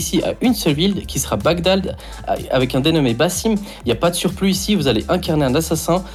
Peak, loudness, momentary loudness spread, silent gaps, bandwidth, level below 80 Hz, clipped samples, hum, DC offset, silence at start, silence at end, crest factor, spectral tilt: -4 dBFS; -18 LUFS; 6 LU; none; 16 kHz; -34 dBFS; under 0.1%; none; under 0.1%; 0 s; 0 s; 14 dB; -5 dB/octave